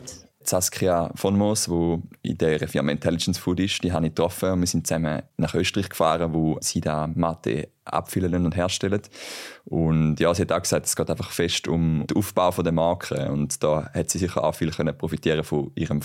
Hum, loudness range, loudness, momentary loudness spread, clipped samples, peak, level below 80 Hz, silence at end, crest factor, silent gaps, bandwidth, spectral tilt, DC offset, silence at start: none; 2 LU; -24 LUFS; 6 LU; under 0.1%; -6 dBFS; -46 dBFS; 0 s; 18 dB; none; 16.5 kHz; -5 dB/octave; under 0.1%; 0 s